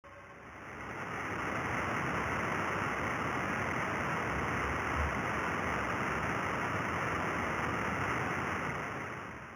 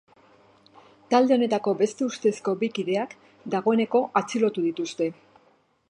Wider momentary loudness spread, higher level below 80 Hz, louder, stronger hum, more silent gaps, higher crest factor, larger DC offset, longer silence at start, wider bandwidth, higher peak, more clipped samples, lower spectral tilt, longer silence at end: about the same, 8 LU vs 8 LU; first, -50 dBFS vs -78 dBFS; second, -34 LUFS vs -25 LUFS; neither; neither; about the same, 16 dB vs 20 dB; neither; second, 0.05 s vs 1.1 s; first, over 20 kHz vs 10.5 kHz; second, -20 dBFS vs -6 dBFS; neither; about the same, -5 dB/octave vs -5.5 dB/octave; second, 0 s vs 0.8 s